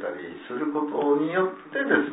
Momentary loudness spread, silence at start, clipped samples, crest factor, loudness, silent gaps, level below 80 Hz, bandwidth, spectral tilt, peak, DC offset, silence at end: 11 LU; 0 s; under 0.1%; 20 dB; -26 LUFS; none; -74 dBFS; 4 kHz; -10 dB/octave; -6 dBFS; under 0.1%; 0 s